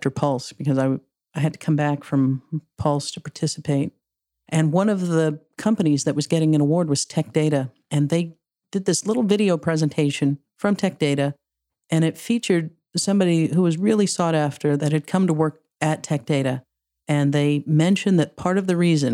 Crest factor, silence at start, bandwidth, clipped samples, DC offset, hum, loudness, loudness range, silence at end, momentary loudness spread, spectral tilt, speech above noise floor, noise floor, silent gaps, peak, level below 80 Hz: 18 dB; 0 s; 13 kHz; under 0.1%; under 0.1%; none; -22 LUFS; 3 LU; 0 s; 7 LU; -6 dB/octave; 60 dB; -80 dBFS; none; -4 dBFS; -62 dBFS